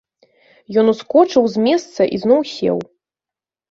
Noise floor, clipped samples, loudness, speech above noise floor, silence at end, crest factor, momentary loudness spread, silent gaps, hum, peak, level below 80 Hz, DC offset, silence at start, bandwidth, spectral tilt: -89 dBFS; under 0.1%; -16 LUFS; 74 dB; 0.85 s; 16 dB; 7 LU; none; none; -2 dBFS; -60 dBFS; under 0.1%; 0.7 s; 7.8 kHz; -6 dB/octave